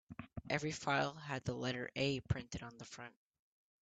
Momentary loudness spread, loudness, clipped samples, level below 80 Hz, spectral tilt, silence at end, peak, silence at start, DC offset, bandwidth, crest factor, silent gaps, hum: 15 LU; -40 LUFS; under 0.1%; -62 dBFS; -5 dB/octave; 0.7 s; -20 dBFS; 0.1 s; under 0.1%; 9 kHz; 22 dB; none; none